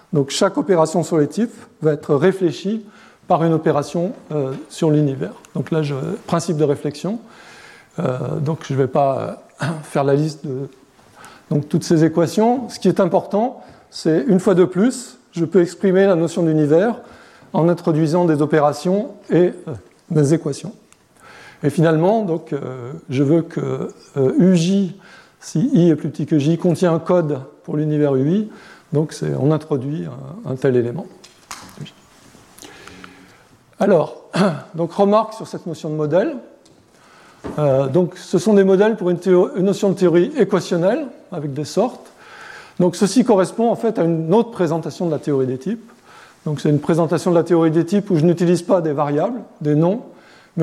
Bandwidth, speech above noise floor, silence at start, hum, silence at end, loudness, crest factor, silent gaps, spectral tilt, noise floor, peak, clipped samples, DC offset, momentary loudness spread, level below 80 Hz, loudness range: 13.5 kHz; 33 dB; 0.1 s; none; 0 s; -18 LUFS; 16 dB; none; -7 dB/octave; -50 dBFS; -2 dBFS; under 0.1%; under 0.1%; 14 LU; -62 dBFS; 5 LU